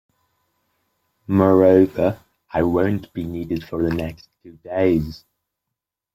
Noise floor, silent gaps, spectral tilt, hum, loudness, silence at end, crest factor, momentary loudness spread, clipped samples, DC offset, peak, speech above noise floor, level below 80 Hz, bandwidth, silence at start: -83 dBFS; none; -9 dB/octave; none; -19 LUFS; 0.95 s; 18 dB; 15 LU; under 0.1%; under 0.1%; -2 dBFS; 64 dB; -48 dBFS; 15 kHz; 1.3 s